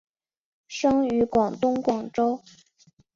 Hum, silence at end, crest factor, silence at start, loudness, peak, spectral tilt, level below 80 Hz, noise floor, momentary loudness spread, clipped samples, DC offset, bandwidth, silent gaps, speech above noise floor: none; 0.8 s; 16 dB; 0.7 s; -24 LUFS; -10 dBFS; -5.5 dB/octave; -58 dBFS; -61 dBFS; 5 LU; under 0.1%; under 0.1%; 7.6 kHz; none; 37 dB